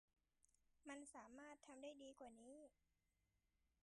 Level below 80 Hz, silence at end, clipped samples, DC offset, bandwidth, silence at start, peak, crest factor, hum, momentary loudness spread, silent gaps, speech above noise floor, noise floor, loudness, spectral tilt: -88 dBFS; 0.2 s; under 0.1%; under 0.1%; 11 kHz; 0.45 s; -46 dBFS; 18 dB; none; 7 LU; none; 27 dB; -89 dBFS; -61 LUFS; -2.5 dB/octave